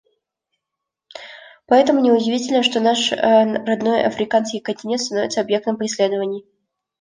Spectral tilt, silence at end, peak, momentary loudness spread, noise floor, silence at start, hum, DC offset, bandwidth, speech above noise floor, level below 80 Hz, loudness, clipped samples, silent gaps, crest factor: -3.5 dB/octave; 0.6 s; -2 dBFS; 12 LU; -82 dBFS; 1.15 s; none; under 0.1%; 9.8 kHz; 65 dB; -64 dBFS; -18 LUFS; under 0.1%; none; 16 dB